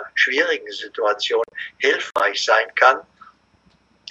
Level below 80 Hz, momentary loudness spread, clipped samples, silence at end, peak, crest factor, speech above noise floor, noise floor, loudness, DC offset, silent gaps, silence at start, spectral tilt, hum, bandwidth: -70 dBFS; 10 LU; under 0.1%; 1.1 s; 0 dBFS; 20 dB; 39 dB; -59 dBFS; -19 LUFS; under 0.1%; none; 0 s; 0 dB/octave; none; 11 kHz